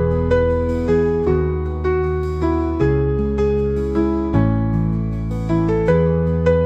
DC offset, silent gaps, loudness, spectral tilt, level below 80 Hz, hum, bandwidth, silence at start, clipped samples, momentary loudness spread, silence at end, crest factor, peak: 0.1%; none; -19 LUFS; -9.5 dB/octave; -28 dBFS; none; 8 kHz; 0 s; under 0.1%; 5 LU; 0 s; 14 dB; -4 dBFS